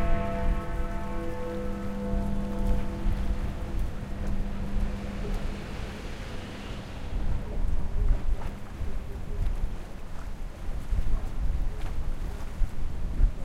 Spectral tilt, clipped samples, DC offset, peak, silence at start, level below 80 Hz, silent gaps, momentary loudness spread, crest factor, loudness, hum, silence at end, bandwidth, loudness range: -7 dB/octave; under 0.1%; under 0.1%; -10 dBFS; 0 s; -30 dBFS; none; 8 LU; 18 dB; -35 LUFS; none; 0 s; 9.6 kHz; 3 LU